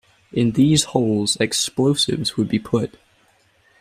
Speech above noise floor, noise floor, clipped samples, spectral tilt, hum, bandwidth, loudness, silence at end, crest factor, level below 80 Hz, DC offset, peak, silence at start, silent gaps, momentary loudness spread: 40 dB; -59 dBFS; under 0.1%; -4.5 dB/octave; none; 15 kHz; -19 LUFS; 0.95 s; 18 dB; -52 dBFS; under 0.1%; -2 dBFS; 0.35 s; none; 7 LU